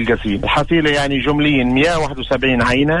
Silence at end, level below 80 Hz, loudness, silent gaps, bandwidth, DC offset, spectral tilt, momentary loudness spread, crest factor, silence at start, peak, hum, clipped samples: 0 s; -32 dBFS; -15 LUFS; none; 11.5 kHz; under 0.1%; -5.5 dB/octave; 4 LU; 12 dB; 0 s; -4 dBFS; none; under 0.1%